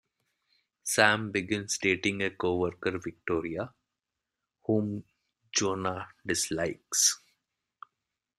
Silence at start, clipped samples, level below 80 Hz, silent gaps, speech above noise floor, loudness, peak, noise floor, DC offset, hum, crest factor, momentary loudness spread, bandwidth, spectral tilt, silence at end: 0.85 s; under 0.1%; -66 dBFS; none; 58 dB; -29 LUFS; -4 dBFS; -88 dBFS; under 0.1%; none; 26 dB; 14 LU; 15.5 kHz; -2.5 dB/octave; 1.2 s